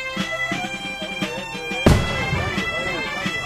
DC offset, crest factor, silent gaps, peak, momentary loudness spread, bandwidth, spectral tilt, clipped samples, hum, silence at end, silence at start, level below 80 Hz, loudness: under 0.1%; 20 dB; none; -2 dBFS; 9 LU; 15.5 kHz; -5 dB/octave; under 0.1%; none; 0 s; 0 s; -34 dBFS; -22 LUFS